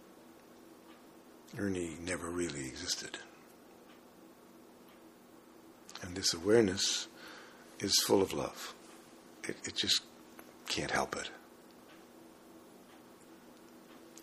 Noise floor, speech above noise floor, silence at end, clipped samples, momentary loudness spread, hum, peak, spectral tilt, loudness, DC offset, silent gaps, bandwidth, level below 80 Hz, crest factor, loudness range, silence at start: -58 dBFS; 24 dB; 0 s; under 0.1%; 27 LU; none; -14 dBFS; -2.5 dB/octave; -34 LUFS; under 0.1%; none; 15.5 kHz; -68 dBFS; 24 dB; 11 LU; 0 s